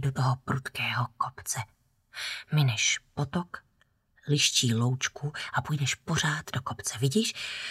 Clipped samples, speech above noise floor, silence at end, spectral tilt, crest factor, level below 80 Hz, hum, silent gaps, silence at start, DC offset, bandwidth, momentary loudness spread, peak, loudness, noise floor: under 0.1%; 40 dB; 0 s; -3.5 dB/octave; 18 dB; -60 dBFS; none; none; 0 s; under 0.1%; 15.5 kHz; 11 LU; -12 dBFS; -29 LUFS; -69 dBFS